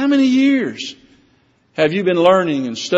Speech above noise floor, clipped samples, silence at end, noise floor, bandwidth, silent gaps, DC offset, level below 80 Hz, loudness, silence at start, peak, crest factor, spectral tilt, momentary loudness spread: 42 dB; under 0.1%; 0 s; -57 dBFS; 8 kHz; none; under 0.1%; -62 dBFS; -15 LUFS; 0 s; 0 dBFS; 16 dB; -4 dB/octave; 16 LU